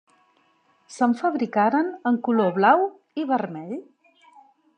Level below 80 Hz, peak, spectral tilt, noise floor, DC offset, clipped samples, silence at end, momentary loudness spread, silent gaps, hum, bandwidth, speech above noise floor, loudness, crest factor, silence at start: -82 dBFS; -4 dBFS; -6.5 dB/octave; -63 dBFS; under 0.1%; under 0.1%; 0.95 s; 15 LU; none; none; 9.4 kHz; 42 dB; -22 LUFS; 20 dB; 0.9 s